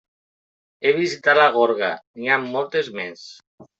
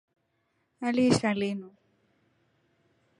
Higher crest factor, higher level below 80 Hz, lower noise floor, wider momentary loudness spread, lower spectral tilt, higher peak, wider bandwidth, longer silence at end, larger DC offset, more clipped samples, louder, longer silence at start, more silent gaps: about the same, 20 dB vs 22 dB; second, -72 dBFS vs -64 dBFS; first, under -90 dBFS vs -75 dBFS; first, 14 LU vs 11 LU; second, -4 dB/octave vs -5.5 dB/octave; first, -2 dBFS vs -10 dBFS; second, 8 kHz vs 11 kHz; second, 0.15 s vs 1.5 s; neither; neither; first, -20 LUFS vs -28 LUFS; about the same, 0.8 s vs 0.8 s; first, 2.07-2.14 s, 3.47-3.58 s vs none